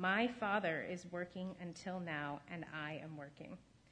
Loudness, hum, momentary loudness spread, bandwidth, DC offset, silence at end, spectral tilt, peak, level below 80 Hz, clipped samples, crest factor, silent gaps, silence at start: -42 LUFS; none; 16 LU; 10 kHz; under 0.1%; 0.3 s; -5.5 dB/octave; -22 dBFS; -74 dBFS; under 0.1%; 20 dB; none; 0 s